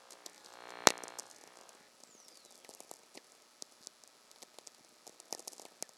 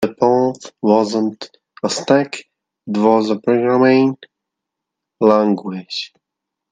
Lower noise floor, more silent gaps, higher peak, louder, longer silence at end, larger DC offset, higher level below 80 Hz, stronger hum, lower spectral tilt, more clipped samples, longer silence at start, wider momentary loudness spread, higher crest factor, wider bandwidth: second, -62 dBFS vs -81 dBFS; neither; about the same, 0 dBFS vs 0 dBFS; second, -35 LUFS vs -16 LUFS; second, 0.35 s vs 0.65 s; neither; second, -76 dBFS vs -66 dBFS; neither; second, -0.5 dB/octave vs -5.5 dB/octave; neither; about the same, 0.1 s vs 0 s; first, 28 LU vs 13 LU; first, 42 dB vs 16 dB; first, 16 kHz vs 9.8 kHz